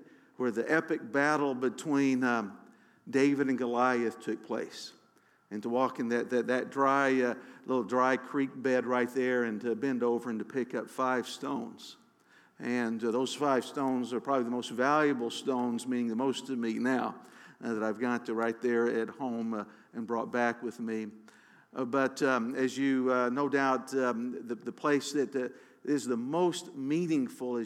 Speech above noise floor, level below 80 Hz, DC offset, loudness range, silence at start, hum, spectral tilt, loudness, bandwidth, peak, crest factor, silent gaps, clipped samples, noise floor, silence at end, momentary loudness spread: 35 dB; under -90 dBFS; under 0.1%; 4 LU; 0 s; none; -5 dB/octave; -31 LUFS; 14 kHz; -12 dBFS; 18 dB; none; under 0.1%; -66 dBFS; 0 s; 10 LU